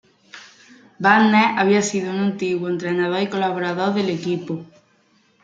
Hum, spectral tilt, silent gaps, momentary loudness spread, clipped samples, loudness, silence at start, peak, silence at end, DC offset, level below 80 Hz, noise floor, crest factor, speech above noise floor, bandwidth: none; -5 dB/octave; none; 10 LU; under 0.1%; -19 LUFS; 0.35 s; -2 dBFS; 0.8 s; under 0.1%; -68 dBFS; -59 dBFS; 18 dB; 40 dB; 9.2 kHz